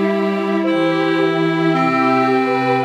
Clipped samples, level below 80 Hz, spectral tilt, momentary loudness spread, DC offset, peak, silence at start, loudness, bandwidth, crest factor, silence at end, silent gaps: under 0.1%; -66 dBFS; -7 dB/octave; 3 LU; under 0.1%; -4 dBFS; 0 s; -16 LUFS; 9.6 kHz; 12 dB; 0 s; none